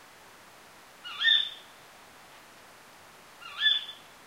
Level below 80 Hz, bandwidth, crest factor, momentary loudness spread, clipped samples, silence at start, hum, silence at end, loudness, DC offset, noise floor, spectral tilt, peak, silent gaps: -78 dBFS; 16 kHz; 22 dB; 23 LU; under 0.1%; 1.05 s; none; 0.3 s; -25 LUFS; under 0.1%; -53 dBFS; 1 dB/octave; -12 dBFS; none